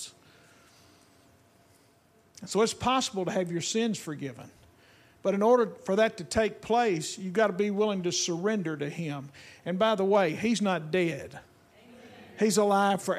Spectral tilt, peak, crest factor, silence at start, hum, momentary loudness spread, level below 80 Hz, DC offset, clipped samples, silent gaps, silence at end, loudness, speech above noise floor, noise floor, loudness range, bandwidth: -4.5 dB/octave; -12 dBFS; 18 dB; 0 s; none; 15 LU; -62 dBFS; under 0.1%; under 0.1%; none; 0 s; -28 LUFS; 35 dB; -63 dBFS; 4 LU; 15 kHz